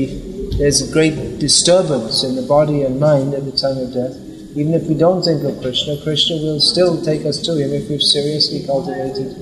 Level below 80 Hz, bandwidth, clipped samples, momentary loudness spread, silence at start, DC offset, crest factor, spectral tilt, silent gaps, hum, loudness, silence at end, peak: -38 dBFS; 13 kHz; under 0.1%; 10 LU; 0 s; under 0.1%; 14 dB; -4 dB/octave; none; none; -16 LUFS; 0 s; -2 dBFS